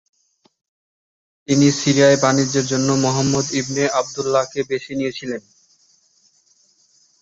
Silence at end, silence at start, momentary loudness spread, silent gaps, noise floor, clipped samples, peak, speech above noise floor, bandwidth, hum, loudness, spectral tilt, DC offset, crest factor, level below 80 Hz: 1.8 s; 1.5 s; 11 LU; none; -59 dBFS; under 0.1%; -2 dBFS; 41 dB; 8 kHz; none; -18 LUFS; -4.5 dB/octave; under 0.1%; 18 dB; -58 dBFS